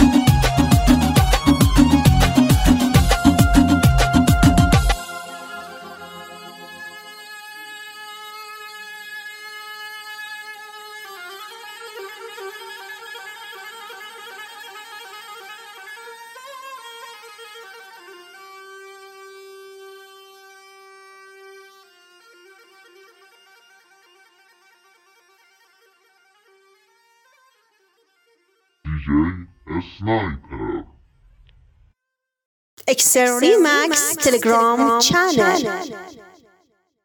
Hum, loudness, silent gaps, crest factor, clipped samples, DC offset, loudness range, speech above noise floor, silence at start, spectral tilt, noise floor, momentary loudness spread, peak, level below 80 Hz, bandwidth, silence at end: none; -16 LUFS; 32.45-32.77 s; 20 dB; under 0.1%; under 0.1%; 23 LU; 65 dB; 0 s; -4.5 dB/octave; -82 dBFS; 24 LU; 0 dBFS; -30 dBFS; 19 kHz; 0.95 s